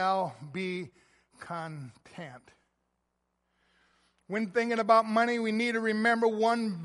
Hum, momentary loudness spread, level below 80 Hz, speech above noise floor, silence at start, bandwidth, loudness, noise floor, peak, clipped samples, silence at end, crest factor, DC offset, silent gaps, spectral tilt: none; 21 LU; -78 dBFS; 50 dB; 0 s; 11.5 kHz; -28 LUFS; -80 dBFS; -10 dBFS; under 0.1%; 0 s; 22 dB; under 0.1%; none; -5.5 dB/octave